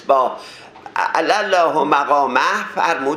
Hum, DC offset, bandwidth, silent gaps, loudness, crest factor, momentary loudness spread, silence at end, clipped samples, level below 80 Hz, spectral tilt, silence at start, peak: none; under 0.1%; 14.5 kHz; none; -17 LUFS; 18 dB; 13 LU; 0 s; under 0.1%; -68 dBFS; -3 dB/octave; 0 s; 0 dBFS